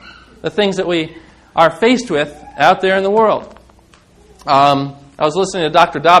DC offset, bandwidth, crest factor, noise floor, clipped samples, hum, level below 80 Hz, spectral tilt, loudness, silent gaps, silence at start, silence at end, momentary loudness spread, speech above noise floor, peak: under 0.1%; 12.5 kHz; 14 dB; -47 dBFS; 0.4%; none; -50 dBFS; -4.5 dB/octave; -14 LUFS; none; 0.05 s; 0 s; 11 LU; 34 dB; 0 dBFS